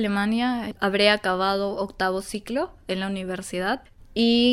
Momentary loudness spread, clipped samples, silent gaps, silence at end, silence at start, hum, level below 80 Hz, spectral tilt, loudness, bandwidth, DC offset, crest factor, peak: 11 LU; under 0.1%; none; 0 s; 0 s; none; -50 dBFS; -4.5 dB/octave; -24 LUFS; 14.5 kHz; under 0.1%; 20 dB; -4 dBFS